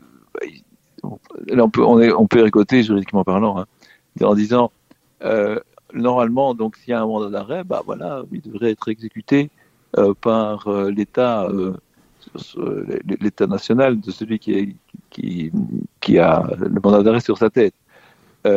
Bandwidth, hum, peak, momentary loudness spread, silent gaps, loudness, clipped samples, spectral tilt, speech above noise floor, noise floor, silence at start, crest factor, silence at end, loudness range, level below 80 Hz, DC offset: 7.6 kHz; none; 0 dBFS; 16 LU; none; -18 LUFS; under 0.1%; -8 dB/octave; 34 dB; -52 dBFS; 0.35 s; 18 dB; 0 s; 6 LU; -54 dBFS; under 0.1%